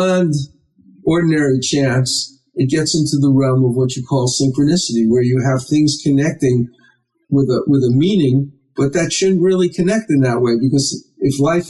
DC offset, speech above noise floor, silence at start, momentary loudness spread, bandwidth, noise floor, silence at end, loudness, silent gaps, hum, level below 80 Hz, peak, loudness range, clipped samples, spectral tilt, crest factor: under 0.1%; 40 dB; 0 s; 6 LU; 12 kHz; -55 dBFS; 0 s; -15 LUFS; none; none; -50 dBFS; -6 dBFS; 1 LU; under 0.1%; -5.5 dB/octave; 10 dB